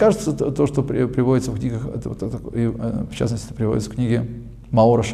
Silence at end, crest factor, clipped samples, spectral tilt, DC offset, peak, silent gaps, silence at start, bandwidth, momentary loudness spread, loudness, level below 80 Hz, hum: 0 s; 16 dB; under 0.1%; -7.5 dB/octave; under 0.1%; -4 dBFS; none; 0 s; 13 kHz; 10 LU; -21 LUFS; -40 dBFS; none